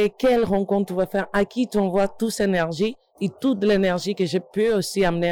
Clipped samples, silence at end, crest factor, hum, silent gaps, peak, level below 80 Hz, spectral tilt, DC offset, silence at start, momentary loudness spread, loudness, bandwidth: under 0.1%; 0 s; 10 dB; none; none; -12 dBFS; -48 dBFS; -5.5 dB/octave; under 0.1%; 0 s; 5 LU; -22 LUFS; 18.5 kHz